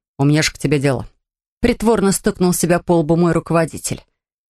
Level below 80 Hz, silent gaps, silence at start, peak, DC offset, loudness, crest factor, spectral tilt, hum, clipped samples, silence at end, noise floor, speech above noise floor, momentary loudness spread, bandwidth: -38 dBFS; 1.48-1.61 s; 0.2 s; -2 dBFS; under 0.1%; -17 LUFS; 16 dB; -5.5 dB/octave; none; under 0.1%; 0.55 s; -71 dBFS; 55 dB; 8 LU; 13 kHz